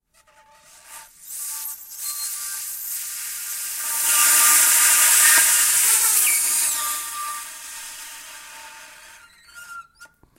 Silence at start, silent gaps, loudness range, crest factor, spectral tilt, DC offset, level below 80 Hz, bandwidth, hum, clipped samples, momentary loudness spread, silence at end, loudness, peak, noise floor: 0.9 s; none; 16 LU; 20 dB; 4 dB/octave; under 0.1%; -64 dBFS; 16 kHz; none; under 0.1%; 23 LU; 0.35 s; -16 LUFS; -2 dBFS; -56 dBFS